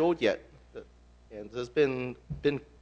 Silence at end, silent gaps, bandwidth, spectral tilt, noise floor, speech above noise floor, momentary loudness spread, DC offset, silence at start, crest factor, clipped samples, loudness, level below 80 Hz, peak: 0.2 s; none; 8.2 kHz; -6.5 dB/octave; -56 dBFS; 26 dB; 21 LU; under 0.1%; 0 s; 20 dB; under 0.1%; -31 LUFS; -56 dBFS; -12 dBFS